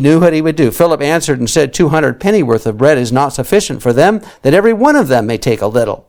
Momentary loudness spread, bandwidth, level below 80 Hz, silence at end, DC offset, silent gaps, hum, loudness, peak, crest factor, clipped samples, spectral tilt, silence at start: 5 LU; over 20 kHz; -38 dBFS; 0.1 s; under 0.1%; none; none; -11 LUFS; 0 dBFS; 10 dB; 0.7%; -5.5 dB/octave; 0 s